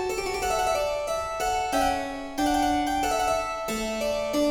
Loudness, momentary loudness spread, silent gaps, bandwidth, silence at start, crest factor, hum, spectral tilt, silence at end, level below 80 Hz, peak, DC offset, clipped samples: -26 LUFS; 5 LU; none; 18 kHz; 0 s; 14 dB; none; -3 dB/octave; 0 s; -44 dBFS; -12 dBFS; under 0.1%; under 0.1%